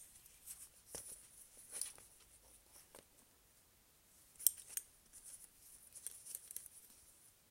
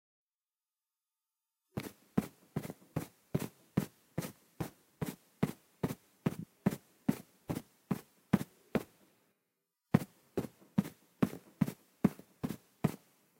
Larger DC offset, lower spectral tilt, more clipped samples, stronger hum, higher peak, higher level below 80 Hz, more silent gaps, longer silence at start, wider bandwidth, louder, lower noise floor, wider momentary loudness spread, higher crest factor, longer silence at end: neither; second, 1 dB/octave vs -7 dB/octave; neither; neither; about the same, -10 dBFS vs -10 dBFS; second, -78 dBFS vs -64 dBFS; neither; second, 0 s vs 1.75 s; about the same, 16.5 kHz vs 16.5 kHz; second, -45 LUFS vs -39 LUFS; second, -70 dBFS vs under -90 dBFS; first, 24 LU vs 10 LU; first, 40 dB vs 28 dB; second, 0 s vs 0.45 s